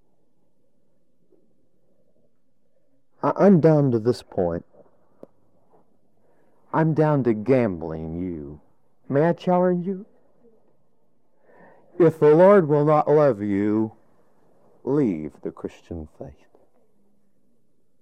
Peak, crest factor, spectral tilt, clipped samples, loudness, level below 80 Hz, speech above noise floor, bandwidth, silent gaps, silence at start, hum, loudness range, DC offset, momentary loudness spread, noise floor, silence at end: -4 dBFS; 18 dB; -9.5 dB/octave; under 0.1%; -20 LUFS; -60 dBFS; 52 dB; 9.6 kHz; none; 3.25 s; none; 10 LU; 0.2%; 20 LU; -72 dBFS; 1.75 s